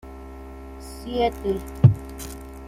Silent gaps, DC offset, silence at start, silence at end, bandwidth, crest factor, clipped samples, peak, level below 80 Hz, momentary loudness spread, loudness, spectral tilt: none; under 0.1%; 0.05 s; 0 s; 16 kHz; 22 dB; under 0.1%; -2 dBFS; -40 dBFS; 22 LU; -22 LUFS; -7.5 dB/octave